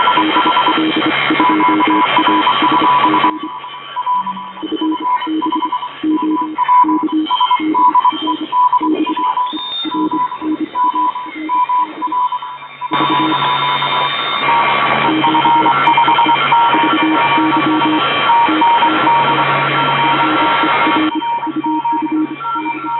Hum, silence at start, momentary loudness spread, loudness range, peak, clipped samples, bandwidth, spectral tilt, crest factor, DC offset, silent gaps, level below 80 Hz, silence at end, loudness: none; 0 s; 8 LU; 5 LU; 0 dBFS; under 0.1%; 4.6 kHz; -8 dB/octave; 14 dB; under 0.1%; none; -58 dBFS; 0 s; -13 LUFS